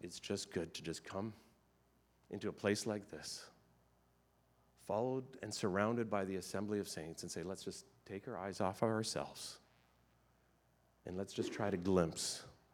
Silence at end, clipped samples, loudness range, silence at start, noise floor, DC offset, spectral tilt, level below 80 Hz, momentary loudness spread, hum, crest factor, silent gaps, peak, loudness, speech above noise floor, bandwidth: 0.2 s; under 0.1%; 4 LU; 0 s; -74 dBFS; under 0.1%; -4.5 dB/octave; -76 dBFS; 13 LU; none; 24 dB; none; -18 dBFS; -41 LUFS; 33 dB; 19 kHz